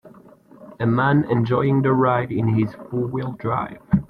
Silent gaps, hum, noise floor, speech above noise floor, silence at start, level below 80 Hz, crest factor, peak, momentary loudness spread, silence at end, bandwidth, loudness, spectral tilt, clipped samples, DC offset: none; none; -47 dBFS; 28 dB; 0.05 s; -48 dBFS; 16 dB; -6 dBFS; 8 LU; 0.05 s; 5.2 kHz; -21 LUFS; -10.5 dB/octave; under 0.1%; under 0.1%